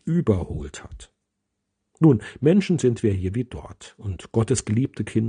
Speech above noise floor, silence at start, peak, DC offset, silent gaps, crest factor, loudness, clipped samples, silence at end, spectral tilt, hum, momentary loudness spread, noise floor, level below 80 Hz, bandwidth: 56 dB; 0.05 s; -4 dBFS; under 0.1%; none; 20 dB; -22 LUFS; under 0.1%; 0 s; -7 dB/octave; none; 19 LU; -79 dBFS; -46 dBFS; 10 kHz